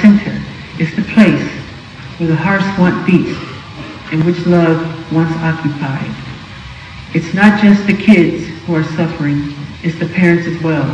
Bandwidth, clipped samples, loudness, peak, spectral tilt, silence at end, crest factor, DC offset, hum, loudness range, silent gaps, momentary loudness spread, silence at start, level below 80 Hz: 8.6 kHz; 0.8%; -13 LUFS; 0 dBFS; -7.5 dB/octave; 0 s; 14 dB; under 0.1%; none; 3 LU; none; 18 LU; 0 s; -42 dBFS